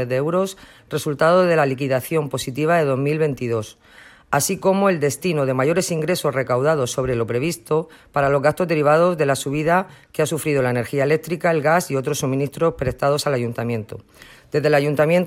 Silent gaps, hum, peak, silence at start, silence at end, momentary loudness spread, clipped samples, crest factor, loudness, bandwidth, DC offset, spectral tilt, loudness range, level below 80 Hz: none; none; -2 dBFS; 0 s; 0 s; 9 LU; under 0.1%; 16 dB; -20 LUFS; 16.5 kHz; under 0.1%; -5.5 dB/octave; 2 LU; -50 dBFS